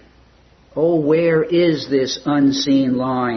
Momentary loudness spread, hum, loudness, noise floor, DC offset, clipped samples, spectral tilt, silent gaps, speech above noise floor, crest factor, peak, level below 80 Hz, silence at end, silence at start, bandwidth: 4 LU; none; -17 LUFS; -51 dBFS; under 0.1%; under 0.1%; -6 dB/octave; none; 34 dB; 12 dB; -4 dBFS; -54 dBFS; 0 s; 0.75 s; 6.4 kHz